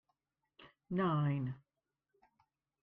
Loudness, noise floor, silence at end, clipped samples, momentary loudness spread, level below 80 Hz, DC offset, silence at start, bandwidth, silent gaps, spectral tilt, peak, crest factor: -37 LUFS; under -90 dBFS; 1.25 s; under 0.1%; 12 LU; -74 dBFS; under 0.1%; 0.6 s; 4.1 kHz; none; -10.5 dB/octave; -24 dBFS; 16 dB